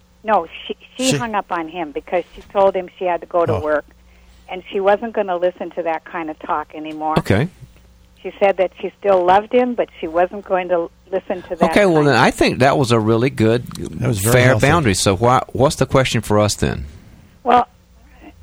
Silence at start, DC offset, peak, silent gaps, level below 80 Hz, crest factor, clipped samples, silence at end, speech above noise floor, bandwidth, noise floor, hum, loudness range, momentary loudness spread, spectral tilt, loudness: 0.25 s; under 0.1%; 0 dBFS; none; -42 dBFS; 18 dB; under 0.1%; 0.15 s; 31 dB; 19.5 kHz; -48 dBFS; none; 6 LU; 13 LU; -5 dB/octave; -17 LUFS